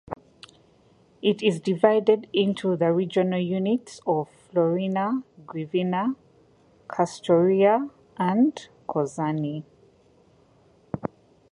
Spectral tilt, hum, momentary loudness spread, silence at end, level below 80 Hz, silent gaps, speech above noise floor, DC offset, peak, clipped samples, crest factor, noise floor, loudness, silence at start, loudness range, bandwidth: -7 dB/octave; none; 15 LU; 0.45 s; -66 dBFS; none; 35 dB; under 0.1%; -4 dBFS; under 0.1%; 20 dB; -59 dBFS; -24 LUFS; 0.1 s; 4 LU; 11 kHz